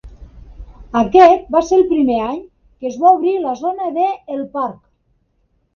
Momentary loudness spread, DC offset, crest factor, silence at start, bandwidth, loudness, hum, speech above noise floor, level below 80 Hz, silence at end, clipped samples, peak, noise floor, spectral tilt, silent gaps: 16 LU; under 0.1%; 16 dB; 0.05 s; 7 kHz; -15 LUFS; none; 48 dB; -42 dBFS; 1 s; under 0.1%; 0 dBFS; -62 dBFS; -6 dB/octave; none